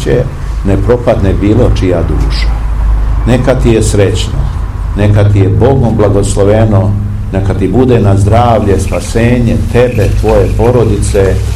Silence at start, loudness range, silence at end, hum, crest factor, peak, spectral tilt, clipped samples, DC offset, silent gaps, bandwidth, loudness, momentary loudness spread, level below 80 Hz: 0 s; 2 LU; 0 s; none; 8 dB; 0 dBFS; -7 dB/octave; 3%; 0.7%; none; 12.5 kHz; -9 LUFS; 7 LU; -14 dBFS